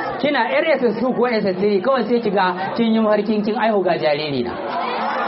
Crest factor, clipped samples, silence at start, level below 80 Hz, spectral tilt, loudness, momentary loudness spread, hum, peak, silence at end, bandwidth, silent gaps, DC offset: 12 dB; under 0.1%; 0 s; -60 dBFS; -4 dB/octave; -18 LUFS; 5 LU; none; -6 dBFS; 0 s; 5.8 kHz; none; under 0.1%